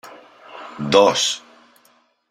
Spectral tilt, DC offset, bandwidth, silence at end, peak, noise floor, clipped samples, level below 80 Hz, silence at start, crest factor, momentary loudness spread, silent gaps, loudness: -3 dB/octave; under 0.1%; 14.5 kHz; 0.9 s; -2 dBFS; -59 dBFS; under 0.1%; -62 dBFS; 0.05 s; 20 dB; 23 LU; none; -17 LUFS